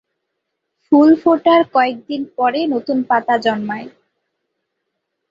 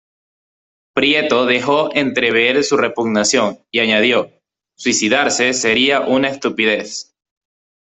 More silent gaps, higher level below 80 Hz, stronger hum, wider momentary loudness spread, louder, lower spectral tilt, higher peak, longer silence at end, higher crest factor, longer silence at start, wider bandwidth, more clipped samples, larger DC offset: neither; second, -64 dBFS vs -58 dBFS; neither; first, 14 LU vs 6 LU; about the same, -15 LUFS vs -15 LUFS; first, -6.5 dB/octave vs -2.5 dB/octave; about the same, -2 dBFS vs -2 dBFS; first, 1.4 s vs 0.9 s; about the same, 16 dB vs 16 dB; about the same, 0.9 s vs 0.95 s; second, 7.2 kHz vs 8.4 kHz; neither; neither